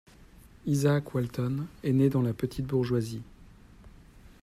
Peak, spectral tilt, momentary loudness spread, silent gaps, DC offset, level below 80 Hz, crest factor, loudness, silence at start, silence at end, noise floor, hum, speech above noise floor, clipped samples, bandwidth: -12 dBFS; -7.5 dB/octave; 9 LU; none; under 0.1%; -54 dBFS; 18 dB; -29 LUFS; 0.65 s; 0.15 s; -54 dBFS; none; 26 dB; under 0.1%; 14.5 kHz